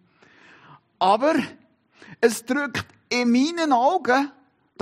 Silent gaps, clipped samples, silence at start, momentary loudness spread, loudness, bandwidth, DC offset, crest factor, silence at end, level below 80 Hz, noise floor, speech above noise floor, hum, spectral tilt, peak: none; under 0.1%; 1 s; 9 LU; -22 LUFS; 14 kHz; under 0.1%; 18 dB; 0.5 s; -70 dBFS; -54 dBFS; 33 dB; none; -4 dB/octave; -4 dBFS